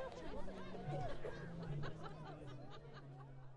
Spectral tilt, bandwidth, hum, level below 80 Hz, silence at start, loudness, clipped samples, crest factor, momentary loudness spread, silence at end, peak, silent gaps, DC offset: -7 dB/octave; 10.5 kHz; none; -58 dBFS; 0 s; -50 LUFS; under 0.1%; 14 dB; 10 LU; 0 s; -32 dBFS; none; under 0.1%